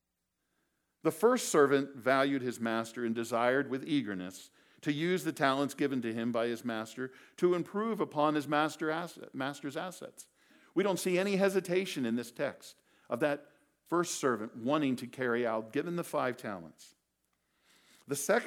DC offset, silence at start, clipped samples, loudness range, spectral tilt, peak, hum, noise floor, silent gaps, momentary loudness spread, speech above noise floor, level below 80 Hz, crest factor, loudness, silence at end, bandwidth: under 0.1%; 1.05 s; under 0.1%; 4 LU; -4.5 dB/octave; -12 dBFS; none; -84 dBFS; none; 12 LU; 52 dB; -88 dBFS; 22 dB; -33 LUFS; 0 s; 18 kHz